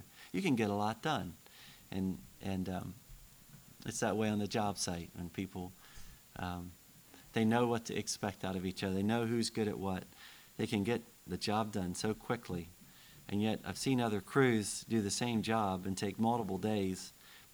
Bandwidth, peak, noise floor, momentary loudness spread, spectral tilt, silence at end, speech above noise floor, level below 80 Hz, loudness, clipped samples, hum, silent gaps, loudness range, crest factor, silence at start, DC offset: over 20 kHz; -16 dBFS; -59 dBFS; 20 LU; -5 dB/octave; 0.1 s; 23 dB; -64 dBFS; -36 LUFS; under 0.1%; none; none; 5 LU; 20 dB; 0 s; under 0.1%